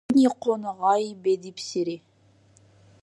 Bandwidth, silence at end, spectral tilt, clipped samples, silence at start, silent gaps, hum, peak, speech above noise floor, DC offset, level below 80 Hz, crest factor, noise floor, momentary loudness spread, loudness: 11.5 kHz; 1.05 s; -5.5 dB/octave; under 0.1%; 0.1 s; none; none; -10 dBFS; 35 dB; under 0.1%; -68 dBFS; 16 dB; -59 dBFS; 11 LU; -25 LUFS